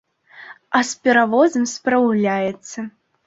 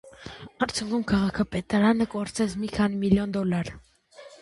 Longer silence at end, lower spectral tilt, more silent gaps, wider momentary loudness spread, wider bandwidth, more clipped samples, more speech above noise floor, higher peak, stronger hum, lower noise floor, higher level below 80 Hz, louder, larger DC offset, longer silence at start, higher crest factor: first, 0.4 s vs 0.05 s; second, -4.5 dB/octave vs -6 dB/octave; neither; first, 16 LU vs 10 LU; second, 8 kHz vs 11.5 kHz; neither; about the same, 25 dB vs 25 dB; first, -2 dBFS vs -8 dBFS; neither; second, -42 dBFS vs -50 dBFS; second, -64 dBFS vs -48 dBFS; first, -18 LUFS vs -26 LUFS; neither; first, 0.35 s vs 0.05 s; about the same, 18 dB vs 18 dB